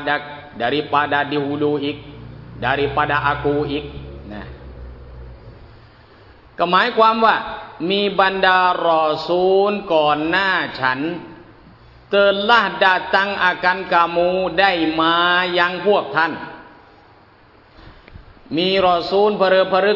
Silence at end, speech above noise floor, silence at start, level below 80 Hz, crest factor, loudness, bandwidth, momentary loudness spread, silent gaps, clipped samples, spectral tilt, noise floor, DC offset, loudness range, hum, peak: 0 s; 32 dB; 0 s; -46 dBFS; 18 dB; -17 LUFS; 6 kHz; 19 LU; none; under 0.1%; -6.5 dB/octave; -49 dBFS; under 0.1%; 7 LU; none; -2 dBFS